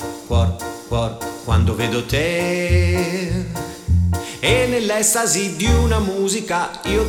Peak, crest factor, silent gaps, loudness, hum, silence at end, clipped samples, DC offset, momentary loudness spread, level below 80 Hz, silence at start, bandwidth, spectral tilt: -2 dBFS; 16 dB; none; -19 LUFS; none; 0 s; under 0.1%; under 0.1%; 8 LU; -28 dBFS; 0 s; 17 kHz; -4.5 dB/octave